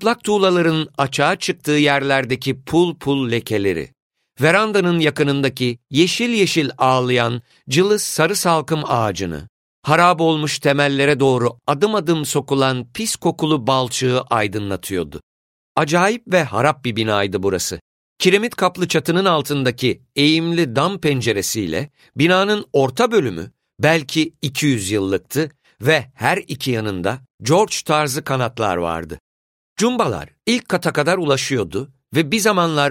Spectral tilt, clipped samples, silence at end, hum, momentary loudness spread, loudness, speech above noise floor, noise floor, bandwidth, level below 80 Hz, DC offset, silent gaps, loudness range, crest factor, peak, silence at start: -4.5 dB/octave; under 0.1%; 0 s; none; 8 LU; -18 LUFS; over 72 dB; under -90 dBFS; 16.5 kHz; -52 dBFS; under 0.1%; 4.02-4.10 s, 9.49-9.82 s, 15.23-15.75 s, 17.81-18.16 s, 27.34-27.38 s, 29.20-29.76 s; 3 LU; 18 dB; -2 dBFS; 0 s